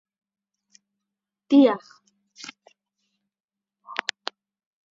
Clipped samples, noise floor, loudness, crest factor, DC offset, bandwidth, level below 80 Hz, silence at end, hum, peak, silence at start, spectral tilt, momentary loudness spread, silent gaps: under 0.1%; -86 dBFS; -22 LUFS; 26 dB; under 0.1%; 7.6 kHz; -82 dBFS; 1 s; none; -2 dBFS; 1.5 s; -2.5 dB/octave; 24 LU; 3.44-3.48 s